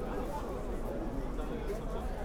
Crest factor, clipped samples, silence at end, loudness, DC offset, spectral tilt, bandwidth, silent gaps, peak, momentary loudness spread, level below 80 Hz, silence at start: 12 dB; under 0.1%; 0 s; -39 LUFS; under 0.1%; -7 dB/octave; 16.5 kHz; none; -24 dBFS; 1 LU; -40 dBFS; 0 s